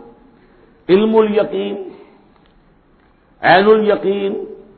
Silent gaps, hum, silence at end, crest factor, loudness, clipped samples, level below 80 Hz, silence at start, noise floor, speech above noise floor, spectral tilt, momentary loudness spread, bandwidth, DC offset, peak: none; none; 0.25 s; 16 dB; -14 LUFS; under 0.1%; -54 dBFS; 0.9 s; -52 dBFS; 39 dB; -9.5 dB/octave; 17 LU; 4.5 kHz; under 0.1%; 0 dBFS